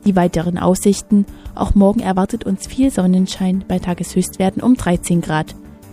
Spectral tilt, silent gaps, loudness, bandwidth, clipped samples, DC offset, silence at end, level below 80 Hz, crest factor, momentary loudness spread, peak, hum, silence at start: -6.5 dB/octave; none; -17 LUFS; 15.5 kHz; under 0.1%; under 0.1%; 0 s; -32 dBFS; 16 dB; 7 LU; 0 dBFS; none; 0.05 s